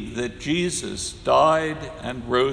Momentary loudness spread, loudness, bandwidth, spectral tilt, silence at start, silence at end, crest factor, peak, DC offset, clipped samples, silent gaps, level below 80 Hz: 14 LU; -23 LUFS; 11 kHz; -4 dB/octave; 0 s; 0 s; 18 dB; -4 dBFS; under 0.1%; under 0.1%; none; -46 dBFS